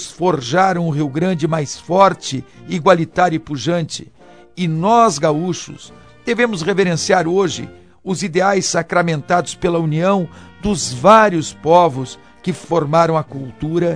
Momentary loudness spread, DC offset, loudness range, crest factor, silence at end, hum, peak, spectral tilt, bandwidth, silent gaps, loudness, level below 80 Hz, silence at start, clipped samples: 14 LU; 0.3%; 3 LU; 16 dB; 0 s; none; 0 dBFS; -5 dB/octave; 10.5 kHz; none; -16 LUFS; -48 dBFS; 0 s; under 0.1%